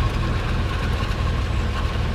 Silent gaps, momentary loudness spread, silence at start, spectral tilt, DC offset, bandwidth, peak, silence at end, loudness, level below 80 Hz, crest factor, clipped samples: none; 1 LU; 0 s; -6 dB/octave; under 0.1%; 13 kHz; -10 dBFS; 0 s; -24 LUFS; -24 dBFS; 10 dB; under 0.1%